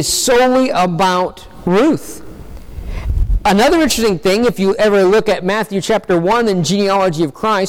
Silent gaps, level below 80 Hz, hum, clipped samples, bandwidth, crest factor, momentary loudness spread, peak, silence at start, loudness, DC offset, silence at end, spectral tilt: none; -26 dBFS; none; under 0.1%; 18 kHz; 10 dB; 11 LU; -4 dBFS; 0 s; -14 LUFS; under 0.1%; 0 s; -4.5 dB/octave